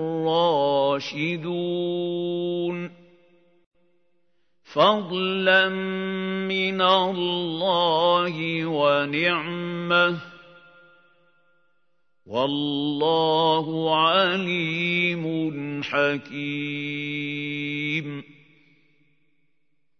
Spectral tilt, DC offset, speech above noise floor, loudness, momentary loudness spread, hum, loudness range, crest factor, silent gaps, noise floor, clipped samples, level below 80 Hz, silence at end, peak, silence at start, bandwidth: -6 dB/octave; under 0.1%; 54 dB; -23 LUFS; 9 LU; none; 7 LU; 20 dB; 3.66-3.71 s; -77 dBFS; under 0.1%; -74 dBFS; 1.65 s; -4 dBFS; 0 s; 6.6 kHz